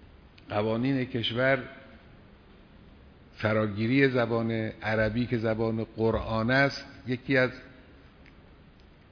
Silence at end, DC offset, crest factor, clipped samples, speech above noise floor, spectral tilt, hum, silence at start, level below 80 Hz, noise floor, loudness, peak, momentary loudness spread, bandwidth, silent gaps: 0.8 s; under 0.1%; 20 dB; under 0.1%; 27 dB; -7.5 dB/octave; none; 0 s; -52 dBFS; -54 dBFS; -28 LUFS; -10 dBFS; 10 LU; 5.4 kHz; none